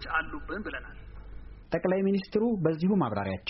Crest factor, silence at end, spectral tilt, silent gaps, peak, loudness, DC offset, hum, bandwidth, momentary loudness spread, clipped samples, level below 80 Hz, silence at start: 16 dB; 0 s; -6 dB/octave; none; -14 dBFS; -29 LUFS; under 0.1%; none; 5.8 kHz; 22 LU; under 0.1%; -48 dBFS; 0 s